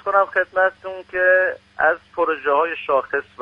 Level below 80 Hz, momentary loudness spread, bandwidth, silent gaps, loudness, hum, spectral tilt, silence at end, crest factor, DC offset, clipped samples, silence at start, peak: -60 dBFS; 7 LU; 5.4 kHz; none; -19 LUFS; none; -5.5 dB/octave; 0 s; 18 dB; under 0.1%; under 0.1%; 0.05 s; -2 dBFS